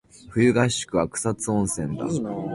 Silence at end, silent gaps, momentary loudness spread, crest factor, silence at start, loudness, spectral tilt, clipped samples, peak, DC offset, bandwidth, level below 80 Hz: 0 s; none; 8 LU; 18 dB; 0.15 s; -24 LUFS; -5 dB/octave; under 0.1%; -6 dBFS; under 0.1%; 11.5 kHz; -50 dBFS